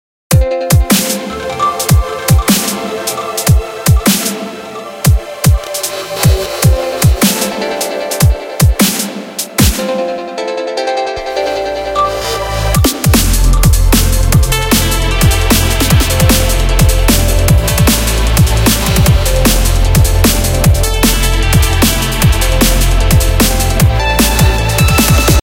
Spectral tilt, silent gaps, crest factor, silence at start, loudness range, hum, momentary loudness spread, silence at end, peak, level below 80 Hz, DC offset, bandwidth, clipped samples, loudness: -4.5 dB/octave; none; 10 dB; 0.3 s; 3 LU; none; 7 LU; 0 s; 0 dBFS; -14 dBFS; under 0.1%; 17.5 kHz; under 0.1%; -11 LUFS